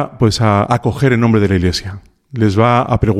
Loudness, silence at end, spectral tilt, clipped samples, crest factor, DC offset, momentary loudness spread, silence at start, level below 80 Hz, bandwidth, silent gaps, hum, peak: -14 LUFS; 0 s; -6.5 dB/octave; under 0.1%; 14 dB; under 0.1%; 8 LU; 0 s; -36 dBFS; 13.5 kHz; none; none; 0 dBFS